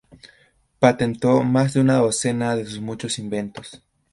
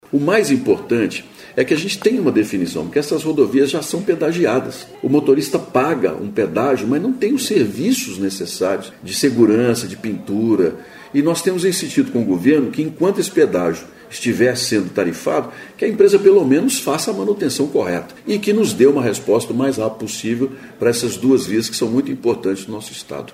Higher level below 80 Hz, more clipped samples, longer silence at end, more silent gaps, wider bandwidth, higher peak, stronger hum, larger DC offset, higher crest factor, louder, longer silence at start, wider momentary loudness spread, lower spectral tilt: about the same, -56 dBFS vs -58 dBFS; neither; first, 0.35 s vs 0.05 s; neither; second, 11.5 kHz vs 16 kHz; about the same, 0 dBFS vs -2 dBFS; neither; neither; about the same, 20 dB vs 16 dB; second, -20 LUFS vs -17 LUFS; about the same, 0.25 s vs 0.15 s; first, 13 LU vs 9 LU; about the same, -5.5 dB/octave vs -5 dB/octave